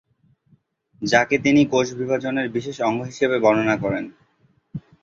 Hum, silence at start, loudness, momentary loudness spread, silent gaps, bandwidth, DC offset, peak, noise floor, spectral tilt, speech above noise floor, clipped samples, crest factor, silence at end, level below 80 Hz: none; 1 s; -20 LUFS; 16 LU; none; 7.8 kHz; under 0.1%; -2 dBFS; -62 dBFS; -5.5 dB/octave; 42 dB; under 0.1%; 20 dB; 0.25 s; -58 dBFS